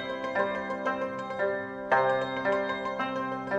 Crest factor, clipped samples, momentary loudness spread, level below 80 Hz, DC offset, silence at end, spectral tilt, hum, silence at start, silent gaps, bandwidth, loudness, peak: 20 dB; under 0.1%; 7 LU; -64 dBFS; under 0.1%; 0 s; -5.5 dB/octave; none; 0 s; none; 9.2 kHz; -30 LUFS; -10 dBFS